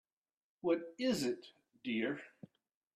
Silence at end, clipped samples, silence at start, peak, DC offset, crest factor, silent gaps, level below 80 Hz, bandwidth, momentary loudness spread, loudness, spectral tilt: 0.65 s; under 0.1%; 0.65 s; -22 dBFS; under 0.1%; 18 dB; none; -80 dBFS; 14.5 kHz; 11 LU; -38 LUFS; -4.5 dB/octave